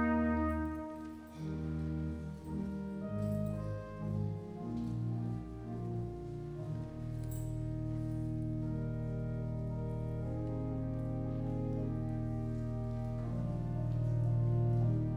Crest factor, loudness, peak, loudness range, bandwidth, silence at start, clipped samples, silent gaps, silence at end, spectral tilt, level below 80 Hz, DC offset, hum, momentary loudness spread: 16 dB; -38 LUFS; -22 dBFS; 4 LU; 8.8 kHz; 0 s; under 0.1%; none; 0 s; -9.5 dB/octave; -48 dBFS; under 0.1%; none; 10 LU